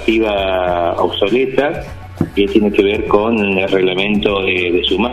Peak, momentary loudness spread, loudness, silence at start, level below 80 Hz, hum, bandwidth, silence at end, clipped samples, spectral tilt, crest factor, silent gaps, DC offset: 0 dBFS; 5 LU; -15 LUFS; 0 s; -36 dBFS; none; 13 kHz; 0 s; under 0.1%; -6.5 dB/octave; 14 dB; none; under 0.1%